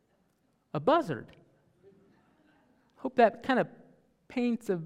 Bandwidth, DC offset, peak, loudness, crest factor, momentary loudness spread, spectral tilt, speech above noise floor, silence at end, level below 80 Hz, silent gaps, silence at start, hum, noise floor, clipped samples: 14 kHz; under 0.1%; -10 dBFS; -30 LUFS; 22 dB; 14 LU; -7 dB/octave; 44 dB; 0 s; -74 dBFS; none; 0.75 s; none; -72 dBFS; under 0.1%